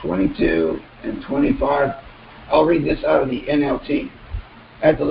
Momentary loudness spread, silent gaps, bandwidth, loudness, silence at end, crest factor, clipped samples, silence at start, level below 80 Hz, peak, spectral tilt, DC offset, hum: 14 LU; none; 5.2 kHz; -20 LUFS; 0 s; 18 dB; under 0.1%; 0 s; -38 dBFS; -2 dBFS; -11.5 dB/octave; under 0.1%; none